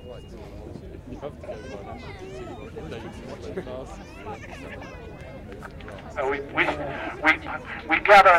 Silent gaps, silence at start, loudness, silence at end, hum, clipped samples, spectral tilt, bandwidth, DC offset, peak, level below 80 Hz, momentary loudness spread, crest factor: none; 0 s; -24 LUFS; 0 s; none; under 0.1%; -5 dB/octave; 16 kHz; under 0.1%; -2 dBFS; -46 dBFS; 19 LU; 24 dB